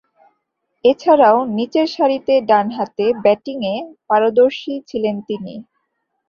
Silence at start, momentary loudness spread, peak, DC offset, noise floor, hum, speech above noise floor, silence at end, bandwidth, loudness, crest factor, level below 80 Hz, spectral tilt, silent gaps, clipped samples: 0.85 s; 14 LU; -2 dBFS; under 0.1%; -72 dBFS; none; 56 dB; 0.65 s; 7 kHz; -17 LUFS; 16 dB; -62 dBFS; -6.5 dB/octave; none; under 0.1%